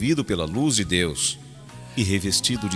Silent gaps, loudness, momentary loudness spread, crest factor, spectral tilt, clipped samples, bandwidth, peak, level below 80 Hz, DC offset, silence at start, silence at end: none; -22 LUFS; 14 LU; 18 dB; -3.5 dB/octave; under 0.1%; 11 kHz; -4 dBFS; -46 dBFS; under 0.1%; 0 s; 0 s